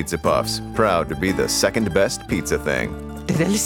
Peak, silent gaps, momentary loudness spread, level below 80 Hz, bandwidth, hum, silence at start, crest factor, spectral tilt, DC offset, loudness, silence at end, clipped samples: -2 dBFS; none; 6 LU; -38 dBFS; over 20 kHz; none; 0 s; 18 dB; -4 dB/octave; under 0.1%; -21 LUFS; 0 s; under 0.1%